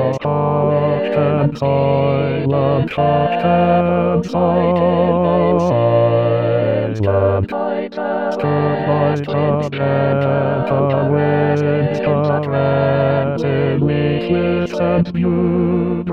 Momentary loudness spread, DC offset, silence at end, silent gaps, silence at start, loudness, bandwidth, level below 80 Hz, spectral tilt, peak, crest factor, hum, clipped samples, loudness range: 3 LU; 0.6%; 0 s; none; 0 s; -16 LUFS; 6.8 kHz; -46 dBFS; -9 dB/octave; -4 dBFS; 12 dB; none; under 0.1%; 3 LU